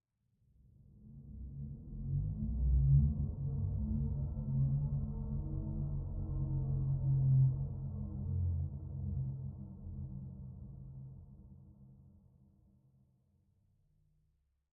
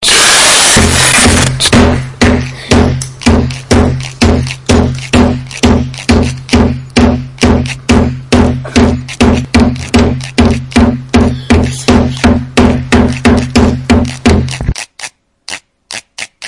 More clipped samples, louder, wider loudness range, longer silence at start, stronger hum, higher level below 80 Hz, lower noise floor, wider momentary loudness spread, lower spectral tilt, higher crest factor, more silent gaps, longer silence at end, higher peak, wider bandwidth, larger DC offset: second, under 0.1% vs 0.9%; second, -37 LUFS vs -9 LUFS; first, 16 LU vs 3 LU; first, 0.95 s vs 0 s; neither; second, -44 dBFS vs -22 dBFS; first, -78 dBFS vs -28 dBFS; first, 20 LU vs 10 LU; first, -18 dB/octave vs -4 dB/octave; first, 18 dB vs 10 dB; neither; first, 2.65 s vs 0 s; second, -18 dBFS vs 0 dBFS; second, 1.4 kHz vs 12 kHz; neither